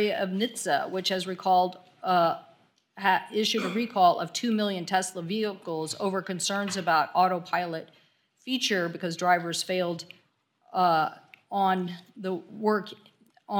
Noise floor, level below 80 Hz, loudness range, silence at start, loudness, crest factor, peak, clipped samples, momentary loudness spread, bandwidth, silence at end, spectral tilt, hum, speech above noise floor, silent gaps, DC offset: -68 dBFS; -82 dBFS; 3 LU; 0 s; -27 LUFS; 20 dB; -8 dBFS; under 0.1%; 10 LU; 18 kHz; 0 s; -4 dB/octave; none; 41 dB; none; under 0.1%